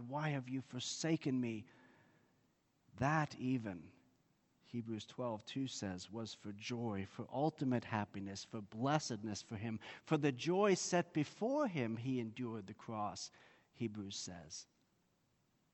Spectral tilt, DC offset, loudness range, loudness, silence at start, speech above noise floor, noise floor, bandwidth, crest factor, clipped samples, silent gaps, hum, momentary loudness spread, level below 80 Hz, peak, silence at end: -5 dB/octave; under 0.1%; 7 LU; -41 LUFS; 0 s; 38 dB; -79 dBFS; 8.4 kHz; 22 dB; under 0.1%; none; none; 12 LU; -76 dBFS; -18 dBFS; 1.1 s